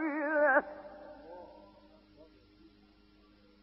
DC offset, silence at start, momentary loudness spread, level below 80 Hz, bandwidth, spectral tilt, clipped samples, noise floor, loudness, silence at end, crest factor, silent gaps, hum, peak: under 0.1%; 0 s; 24 LU; -70 dBFS; 5.6 kHz; -3 dB/octave; under 0.1%; -63 dBFS; -29 LUFS; 1.4 s; 22 dB; none; none; -14 dBFS